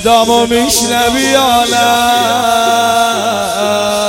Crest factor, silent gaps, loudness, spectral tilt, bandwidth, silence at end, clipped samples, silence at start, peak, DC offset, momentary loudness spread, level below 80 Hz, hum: 10 dB; none; -10 LUFS; -2 dB/octave; 17 kHz; 0 s; under 0.1%; 0 s; 0 dBFS; under 0.1%; 4 LU; -40 dBFS; none